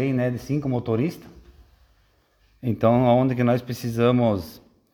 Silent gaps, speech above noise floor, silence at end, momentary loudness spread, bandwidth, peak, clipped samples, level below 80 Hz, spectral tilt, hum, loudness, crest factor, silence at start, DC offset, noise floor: none; 41 dB; 0.35 s; 11 LU; 18.5 kHz; -6 dBFS; under 0.1%; -52 dBFS; -8 dB/octave; none; -22 LUFS; 18 dB; 0 s; under 0.1%; -62 dBFS